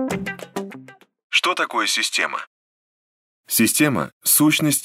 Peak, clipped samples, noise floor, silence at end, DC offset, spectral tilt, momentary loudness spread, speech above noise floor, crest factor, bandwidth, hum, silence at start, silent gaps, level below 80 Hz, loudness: -4 dBFS; under 0.1%; -44 dBFS; 0 s; under 0.1%; -2.5 dB/octave; 16 LU; 25 dB; 18 dB; 16 kHz; none; 0 s; 1.24-1.30 s, 2.47-3.44 s, 4.13-4.21 s; -60 dBFS; -19 LUFS